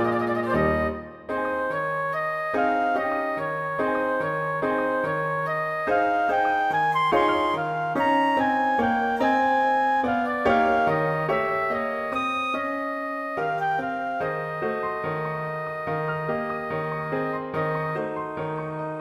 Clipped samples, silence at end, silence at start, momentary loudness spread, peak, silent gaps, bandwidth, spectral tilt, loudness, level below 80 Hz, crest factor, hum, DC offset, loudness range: under 0.1%; 0 s; 0 s; 8 LU; -8 dBFS; none; 15.5 kHz; -6.5 dB/octave; -25 LUFS; -52 dBFS; 16 dB; none; under 0.1%; 6 LU